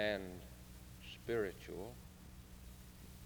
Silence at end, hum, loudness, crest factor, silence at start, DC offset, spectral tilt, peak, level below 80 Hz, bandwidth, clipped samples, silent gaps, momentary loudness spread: 0 s; none; -46 LUFS; 22 dB; 0 s; under 0.1%; -5 dB/octave; -24 dBFS; -60 dBFS; over 20 kHz; under 0.1%; none; 16 LU